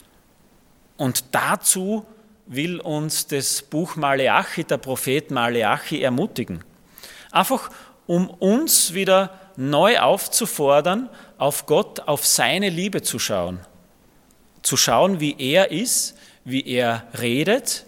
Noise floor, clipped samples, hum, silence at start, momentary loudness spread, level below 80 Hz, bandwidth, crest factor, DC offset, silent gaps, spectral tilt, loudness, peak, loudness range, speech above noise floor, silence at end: -55 dBFS; under 0.1%; none; 1 s; 11 LU; -62 dBFS; 17.5 kHz; 20 dB; under 0.1%; none; -3 dB/octave; -20 LUFS; 0 dBFS; 5 LU; 35 dB; 0.05 s